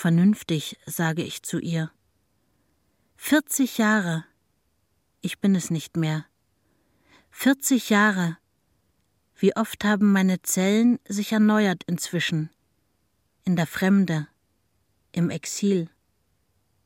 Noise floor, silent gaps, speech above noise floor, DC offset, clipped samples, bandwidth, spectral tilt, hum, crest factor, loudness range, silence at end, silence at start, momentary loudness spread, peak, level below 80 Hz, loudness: -71 dBFS; none; 49 dB; under 0.1%; under 0.1%; 16.5 kHz; -5 dB/octave; none; 18 dB; 5 LU; 1 s; 0 s; 12 LU; -6 dBFS; -68 dBFS; -24 LUFS